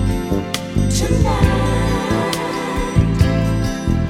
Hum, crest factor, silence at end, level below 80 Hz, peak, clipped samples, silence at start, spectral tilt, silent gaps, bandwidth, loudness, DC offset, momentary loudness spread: none; 16 dB; 0 s; -24 dBFS; 0 dBFS; under 0.1%; 0 s; -6 dB/octave; none; 16 kHz; -18 LUFS; under 0.1%; 6 LU